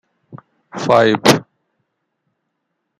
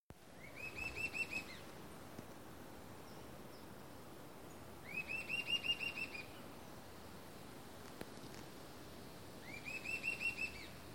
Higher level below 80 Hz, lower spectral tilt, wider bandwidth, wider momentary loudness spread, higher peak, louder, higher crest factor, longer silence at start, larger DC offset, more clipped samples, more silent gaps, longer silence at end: first, -56 dBFS vs -68 dBFS; first, -4.5 dB/octave vs -3 dB/octave; about the same, 15.5 kHz vs 16.5 kHz; about the same, 14 LU vs 16 LU; first, 0 dBFS vs -28 dBFS; first, -14 LUFS vs -45 LUFS; about the same, 20 dB vs 20 dB; first, 0.35 s vs 0 s; second, under 0.1% vs 0.1%; neither; second, none vs 0.00-0.10 s; first, 1.6 s vs 0 s